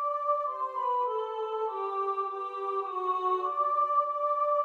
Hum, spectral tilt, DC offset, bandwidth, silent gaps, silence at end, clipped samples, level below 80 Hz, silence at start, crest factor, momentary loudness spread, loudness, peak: none; -3.5 dB/octave; under 0.1%; 6.6 kHz; none; 0 s; under 0.1%; -84 dBFS; 0 s; 12 dB; 6 LU; -30 LUFS; -18 dBFS